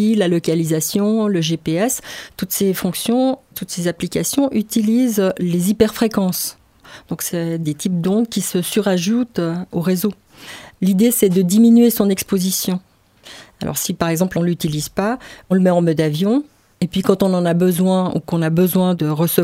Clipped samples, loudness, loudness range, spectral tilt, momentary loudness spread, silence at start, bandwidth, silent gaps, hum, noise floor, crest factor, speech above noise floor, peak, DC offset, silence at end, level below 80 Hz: under 0.1%; -17 LUFS; 4 LU; -5.5 dB/octave; 9 LU; 0 s; 16.5 kHz; none; none; -43 dBFS; 18 dB; 26 dB; 0 dBFS; under 0.1%; 0 s; -50 dBFS